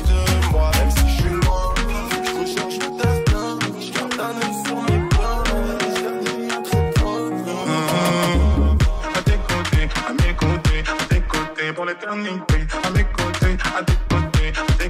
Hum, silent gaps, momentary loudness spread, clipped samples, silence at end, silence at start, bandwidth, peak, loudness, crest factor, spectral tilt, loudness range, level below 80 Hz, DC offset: none; none; 6 LU; under 0.1%; 0 s; 0 s; 16 kHz; -4 dBFS; -20 LUFS; 16 dB; -5 dB/octave; 2 LU; -22 dBFS; under 0.1%